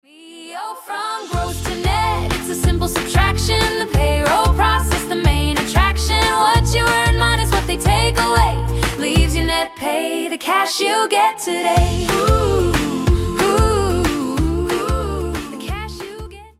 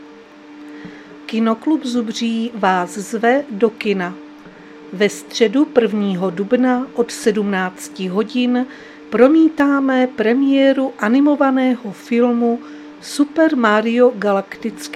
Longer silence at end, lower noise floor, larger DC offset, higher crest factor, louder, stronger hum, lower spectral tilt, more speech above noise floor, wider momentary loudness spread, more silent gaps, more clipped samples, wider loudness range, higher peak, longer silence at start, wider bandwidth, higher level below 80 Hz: about the same, 0.1 s vs 0 s; about the same, -38 dBFS vs -40 dBFS; neither; about the same, 16 dB vs 16 dB; about the same, -17 LUFS vs -17 LUFS; neither; about the same, -4.5 dB/octave vs -5.5 dB/octave; about the same, 22 dB vs 24 dB; second, 10 LU vs 13 LU; neither; neither; about the same, 3 LU vs 5 LU; about the same, 0 dBFS vs 0 dBFS; first, 0.2 s vs 0 s; first, 16 kHz vs 14 kHz; first, -24 dBFS vs -64 dBFS